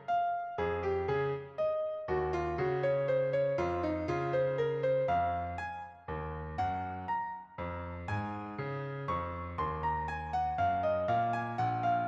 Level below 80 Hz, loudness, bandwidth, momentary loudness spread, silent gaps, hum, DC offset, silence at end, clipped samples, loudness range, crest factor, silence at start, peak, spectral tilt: -56 dBFS; -34 LUFS; 7.4 kHz; 9 LU; none; none; under 0.1%; 0 s; under 0.1%; 6 LU; 12 dB; 0 s; -20 dBFS; -8 dB/octave